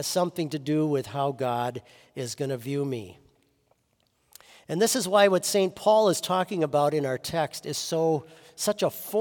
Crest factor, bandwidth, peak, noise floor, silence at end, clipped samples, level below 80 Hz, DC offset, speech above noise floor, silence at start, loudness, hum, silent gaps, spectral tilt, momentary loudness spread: 20 dB; 18 kHz; -8 dBFS; -71 dBFS; 0 s; under 0.1%; -70 dBFS; under 0.1%; 45 dB; 0 s; -26 LUFS; none; none; -4.5 dB/octave; 12 LU